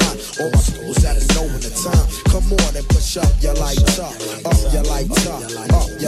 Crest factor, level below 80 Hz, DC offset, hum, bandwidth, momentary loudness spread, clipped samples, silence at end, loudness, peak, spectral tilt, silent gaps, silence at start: 14 dB; -18 dBFS; under 0.1%; none; 13.5 kHz; 6 LU; under 0.1%; 0 s; -18 LUFS; -2 dBFS; -4.5 dB/octave; none; 0 s